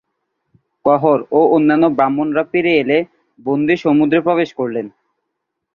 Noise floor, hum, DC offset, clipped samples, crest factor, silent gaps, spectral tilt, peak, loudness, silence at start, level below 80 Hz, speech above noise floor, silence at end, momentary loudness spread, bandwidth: -76 dBFS; none; under 0.1%; under 0.1%; 16 dB; none; -8 dB/octave; 0 dBFS; -15 LUFS; 0.85 s; -58 dBFS; 62 dB; 0.85 s; 10 LU; 6.6 kHz